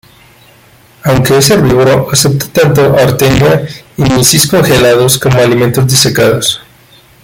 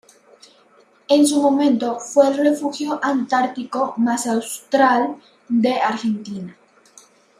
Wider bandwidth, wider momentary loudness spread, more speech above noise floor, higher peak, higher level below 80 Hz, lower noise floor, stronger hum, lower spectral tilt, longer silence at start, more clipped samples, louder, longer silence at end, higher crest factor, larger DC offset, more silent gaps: first, over 20 kHz vs 15 kHz; second, 6 LU vs 10 LU; about the same, 34 dB vs 36 dB; about the same, 0 dBFS vs -2 dBFS; first, -34 dBFS vs -72 dBFS; second, -41 dBFS vs -54 dBFS; neither; about the same, -4.5 dB/octave vs -4 dB/octave; about the same, 1.05 s vs 1.1 s; first, 0.2% vs under 0.1%; first, -8 LUFS vs -19 LUFS; second, 0.65 s vs 0.85 s; second, 8 dB vs 18 dB; neither; neither